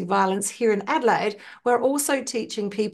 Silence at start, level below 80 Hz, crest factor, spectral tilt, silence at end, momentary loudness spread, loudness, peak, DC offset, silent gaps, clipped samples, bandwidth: 0 s; -72 dBFS; 16 dB; -3.5 dB/octave; 0 s; 7 LU; -23 LUFS; -8 dBFS; under 0.1%; none; under 0.1%; 12.5 kHz